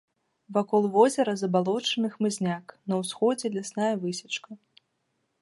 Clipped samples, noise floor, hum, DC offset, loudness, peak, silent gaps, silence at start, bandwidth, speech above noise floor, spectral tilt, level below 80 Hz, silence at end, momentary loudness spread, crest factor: under 0.1%; -76 dBFS; none; under 0.1%; -27 LUFS; -6 dBFS; none; 0.5 s; 11.5 kHz; 50 dB; -5 dB/octave; -78 dBFS; 0.85 s; 10 LU; 20 dB